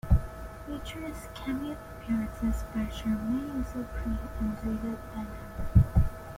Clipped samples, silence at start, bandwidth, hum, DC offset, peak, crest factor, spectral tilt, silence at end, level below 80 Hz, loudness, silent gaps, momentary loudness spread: under 0.1%; 0.05 s; 16.5 kHz; none; under 0.1%; -8 dBFS; 22 dB; -7.5 dB/octave; 0 s; -34 dBFS; -32 LUFS; none; 13 LU